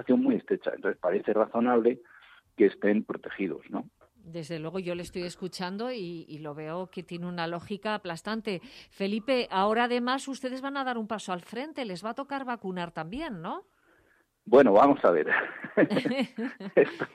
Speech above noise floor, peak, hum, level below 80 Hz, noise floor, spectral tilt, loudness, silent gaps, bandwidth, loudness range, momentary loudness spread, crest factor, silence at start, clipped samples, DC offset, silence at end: 39 dB; -10 dBFS; none; -66 dBFS; -67 dBFS; -6 dB/octave; -28 LUFS; none; 13 kHz; 11 LU; 14 LU; 20 dB; 0 s; under 0.1%; under 0.1%; 0.1 s